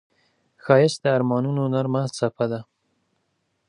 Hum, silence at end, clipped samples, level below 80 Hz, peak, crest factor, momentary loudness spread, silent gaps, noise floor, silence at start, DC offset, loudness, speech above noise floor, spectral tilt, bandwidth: none; 1.05 s; under 0.1%; -68 dBFS; -2 dBFS; 22 dB; 9 LU; none; -72 dBFS; 0.65 s; under 0.1%; -22 LUFS; 51 dB; -6.5 dB/octave; 11 kHz